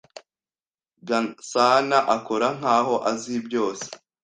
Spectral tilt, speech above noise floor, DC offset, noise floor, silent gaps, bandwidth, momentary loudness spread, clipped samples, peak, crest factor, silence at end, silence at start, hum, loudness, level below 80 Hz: -3.5 dB/octave; over 68 dB; under 0.1%; under -90 dBFS; 0.67-0.78 s; 9.8 kHz; 10 LU; under 0.1%; -4 dBFS; 20 dB; 0.25 s; 0.15 s; none; -22 LUFS; -70 dBFS